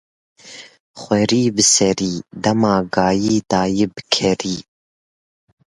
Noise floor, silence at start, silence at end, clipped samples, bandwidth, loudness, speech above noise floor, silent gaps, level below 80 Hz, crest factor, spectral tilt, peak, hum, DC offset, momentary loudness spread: under -90 dBFS; 0.45 s; 1.05 s; under 0.1%; 11.5 kHz; -17 LUFS; over 73 dB; 0.80-0.94 s; -50 dBFS; 18 dB; -3.5 dB/octave; 0 dBFS; none; under 0.1%; 16 LU